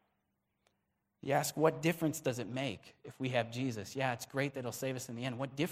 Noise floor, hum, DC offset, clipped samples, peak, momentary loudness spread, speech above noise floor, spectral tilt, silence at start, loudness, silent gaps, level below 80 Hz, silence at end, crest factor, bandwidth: -82 dBFS; none; under 0.1%; under 0.1%; -14 dBFS; 9 LU; 46 dB; -5 dB/octave; 1.25 s; -36 LUFS; none; -74 dBFS; 0 s; 22 dB; 16 kHz